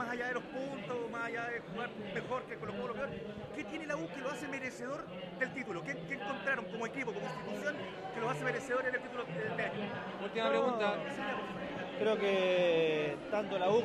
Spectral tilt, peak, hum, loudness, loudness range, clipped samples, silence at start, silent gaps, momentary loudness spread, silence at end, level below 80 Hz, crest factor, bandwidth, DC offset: -5 dB/octave; -20 dBFS; none; -37 LUFS; 7 LU; under 0.1%; 0 s; none; 10 LU; 0 s; -70 dBFS; 18 dB; 13 kHz; under 0.1%